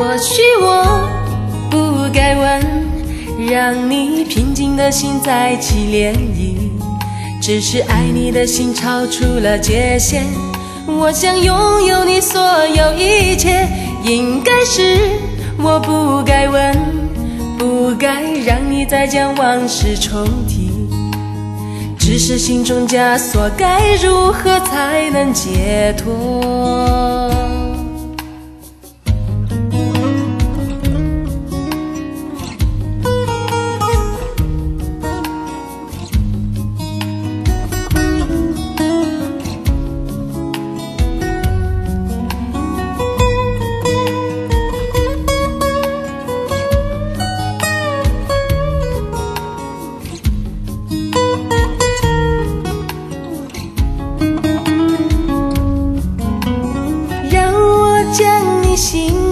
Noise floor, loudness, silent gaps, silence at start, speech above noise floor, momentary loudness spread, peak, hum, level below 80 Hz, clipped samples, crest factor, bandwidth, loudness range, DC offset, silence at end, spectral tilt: -38 dBFS; -15 LUFS; none; 0 s; 25 dB; 11 LU; 0 dBFS; none; -22 dBFS; under 0.1%; 14 dB; 13.5 kHz; 7 LU; under 0.1%; 0 s; -4.5 dB/octave